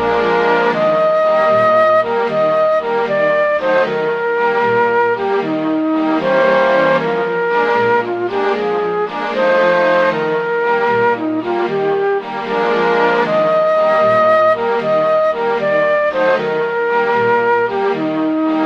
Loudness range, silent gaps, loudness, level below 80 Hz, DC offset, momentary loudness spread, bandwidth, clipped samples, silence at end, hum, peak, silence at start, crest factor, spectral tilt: 2 LU; none; -14 LUFS; -54 dBFS; under 0.1%; 5 LU; 7.4 kHz; under 0.1%; 0 s; none; -2 dBFS; 0 s; 14 dB; -6.5 dB/octave